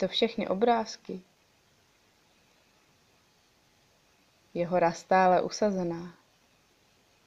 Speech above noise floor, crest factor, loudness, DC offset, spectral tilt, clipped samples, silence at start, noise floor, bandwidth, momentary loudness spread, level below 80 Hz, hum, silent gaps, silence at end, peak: 38 dB; 20 dB; -28 LUFS; under 0.1%; -5 dB/octave; under 0.1%; 0 s; -66 dBFS; 10 kHz; 18 LU; -68 dBFS; none; none; 1.15 s; -10 dBFS